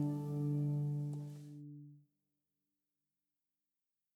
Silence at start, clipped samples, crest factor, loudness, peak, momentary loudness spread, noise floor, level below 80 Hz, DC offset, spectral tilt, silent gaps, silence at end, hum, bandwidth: 0 s; under 0.1%; 16 dB; -39 LUFS; -28 dBFS; 18 LU; under -90 dBFS; -80 dBFS; under 0.1%; -10 dB/octave; none; 2.15 s; none; 7.8 kHz